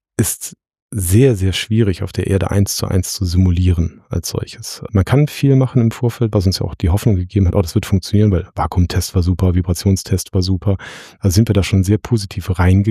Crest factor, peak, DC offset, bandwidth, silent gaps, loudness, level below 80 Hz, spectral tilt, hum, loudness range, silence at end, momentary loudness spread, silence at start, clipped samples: 14 dB; 0 dBFS; under 0.1%; 15 kHz; 0.82-0.89 s; -16 LUFS; -30 dBFS; -6 dB/octave; none; 2 LU; 0 s; 8 LU; 0.2 s; under 0.1%